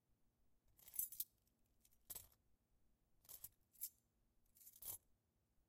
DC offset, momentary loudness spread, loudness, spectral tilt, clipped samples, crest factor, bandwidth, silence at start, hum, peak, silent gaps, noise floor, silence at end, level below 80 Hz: under 0.1%; 18 LU; -52 LUFS; 0 dB/octave; under 0.1%; 32 dB; 17 kHz; 0.7 s; none; -28 dBFS; none; -83 dBFS; 0.7 s; -82 dBFS